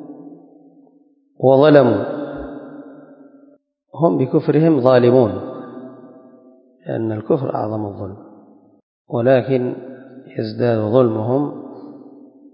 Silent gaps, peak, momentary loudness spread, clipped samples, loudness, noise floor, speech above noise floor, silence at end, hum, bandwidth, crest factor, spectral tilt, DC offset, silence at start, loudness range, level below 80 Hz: 8.83-9.05 s; 0 dBFS; 25 LU; under 0.1%; -17 LUFS; -55 dBFS; 40 dB; 0.45 s; none; 5.4 kHz; 18 dB; -11 dB/octave; under 0.1%; 0 s; 7 LU; -56 dBFS